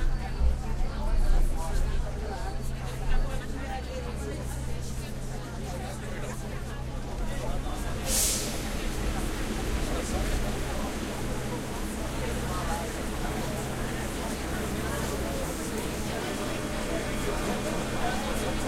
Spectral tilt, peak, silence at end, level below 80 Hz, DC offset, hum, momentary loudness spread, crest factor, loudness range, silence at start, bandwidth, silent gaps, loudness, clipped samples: -4.5 dB/octave; -12 dBFS; 0 s; -32 dBFS; under 0.1%; none; 6 LU; 16 dB; 6 LU; 0 s; 16 kHz; none; -32 LUFS; under 0.1%